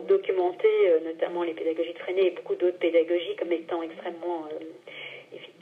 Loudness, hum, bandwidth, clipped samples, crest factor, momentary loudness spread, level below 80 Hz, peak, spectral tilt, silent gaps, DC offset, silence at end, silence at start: -27 LUFS; none; 4.8 kHz; under 0.1%; 16 dB; 17 LU; under -90 dBFS; -12 dBFS; -6 dB/octave; none; under 0.1%; 0.15 s; 0 s